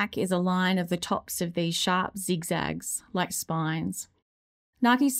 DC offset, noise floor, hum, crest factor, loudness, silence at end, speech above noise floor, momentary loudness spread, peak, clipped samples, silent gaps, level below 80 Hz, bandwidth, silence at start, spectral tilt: under 0.1%; under -90 dBFS; none; 16 dB; -28 LUFS; 0 s; over 63 dB; 7 LU; -12 dBFS; under 0.1%; 4.22-4.73 s; -60 dBFS; 16 kHz; 0 s; -4 dB/octave